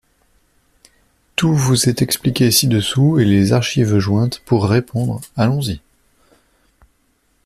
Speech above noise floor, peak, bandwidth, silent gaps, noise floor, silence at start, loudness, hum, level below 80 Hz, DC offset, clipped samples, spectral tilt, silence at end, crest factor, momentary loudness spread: 46 dB; 0 dBFS; 15.5 kHz; none; -61 dBFS; 1.4 s; -16 LUFS; none; -46 dBFS; under 0.1%; under 0.1%; -5 dB/octave; 1.65 s; 18 dB; 8 LU